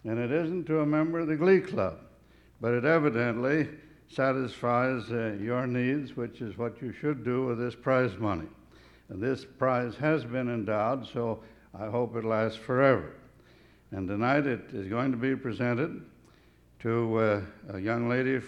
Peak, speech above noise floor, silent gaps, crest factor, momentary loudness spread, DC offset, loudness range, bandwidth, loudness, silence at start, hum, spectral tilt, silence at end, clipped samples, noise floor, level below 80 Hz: -8 dBFS; 31 dB; none; 20 dB; 11 LU; under 0.1%; 4 LU; 10.5 kHz; -29 LUFS; 0.05 s; none; -8.5 dB/octave; 0 s; under 0.1%; -59 dBFS; -62 dBFS